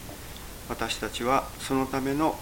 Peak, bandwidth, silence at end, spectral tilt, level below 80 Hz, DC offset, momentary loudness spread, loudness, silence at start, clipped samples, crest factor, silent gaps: -10 dBFS; 17 kHz; 0 s; -4.5 dB/octave; -46 dBFS; under 0.1%; 14 LU; -28 LUFS; 0 s; under 0.1%; 20 dB; none